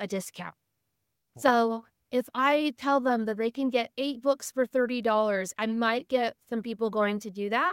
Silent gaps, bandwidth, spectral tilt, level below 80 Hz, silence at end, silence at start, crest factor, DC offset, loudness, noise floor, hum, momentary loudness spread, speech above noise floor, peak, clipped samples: none; 17 kHz; -4.5 dB/octave; -78 dBFS; 0 s; 0 s; 22 dB; under 0.1%; -28 LUFS; -81 dBFS; none; 9 LU; 53 dB; -6 dBFS; under 0.1%